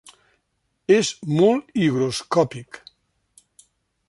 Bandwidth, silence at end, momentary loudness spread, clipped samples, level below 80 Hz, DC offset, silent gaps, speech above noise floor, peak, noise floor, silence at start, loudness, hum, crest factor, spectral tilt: 11.5 kHz; 1.3 s; 18 LU; under 0.1%; -62 dBFS; under 0.1%; none; 53 dB; -4 dBFS; -73 dBFS; 0.9 s; -20 LUFS; none; 18 dB; -5.5 dB/octave